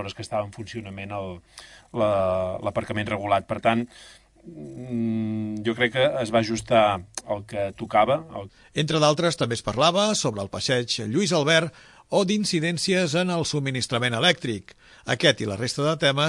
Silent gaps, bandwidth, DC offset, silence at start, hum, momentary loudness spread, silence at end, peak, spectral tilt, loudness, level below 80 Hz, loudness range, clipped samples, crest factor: none; 11.5 kHz; under 0.1%; 0 s; none; 14 LU; 0 s; -4 dBFS; -4.5 dB/octave; -24 LUFS; -56 dBFS; 4 LU; under 0.1%; 20 dB